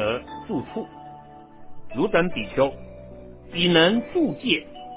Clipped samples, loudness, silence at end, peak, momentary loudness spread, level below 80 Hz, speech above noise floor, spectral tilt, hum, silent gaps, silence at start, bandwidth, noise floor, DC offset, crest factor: under 0.1%; -23 LUFS; 0 s; -4 dBFS; 25 LU; -50 dBFS; 22 dB; -9.5 dB/octave; none; none; 0 s; 4 kHz; -44 dBFS; under 0.1%; 20 dB